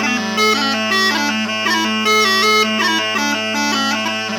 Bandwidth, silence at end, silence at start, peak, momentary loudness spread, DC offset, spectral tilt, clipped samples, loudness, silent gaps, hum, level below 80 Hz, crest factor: 19.5 kHz; 0 s; 0 s; -2 dBFS; 5 LU; under 0.1%; -2 dB/octave; under 0.1%; -15 LUFS; none; none; -68 dBFS; 14 dB